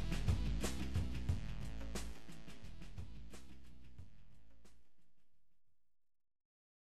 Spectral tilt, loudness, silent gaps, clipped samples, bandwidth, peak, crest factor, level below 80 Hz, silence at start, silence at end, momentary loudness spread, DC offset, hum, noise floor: -5.5 dB/octave; -44 LUFS; none; under 0.1%; 13.5 kHz; -24 dBFS; 20 dB; -48 dBFS; 0 s; 0.45 s; 22 LU; 0.5%; none; -70 dBFS